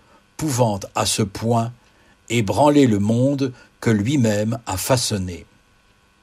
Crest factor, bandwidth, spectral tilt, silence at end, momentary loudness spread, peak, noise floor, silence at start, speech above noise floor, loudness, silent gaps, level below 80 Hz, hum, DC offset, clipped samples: 18 dB; 15.5 kHz; -5.5 dB/octave; 0.8 s; 11 LU; -2 dBFS; -57 dBFS; 0.4 s; 38 dB; -20 LUFS; none; -52 dBFS; none; under 0.1%; under 0.1%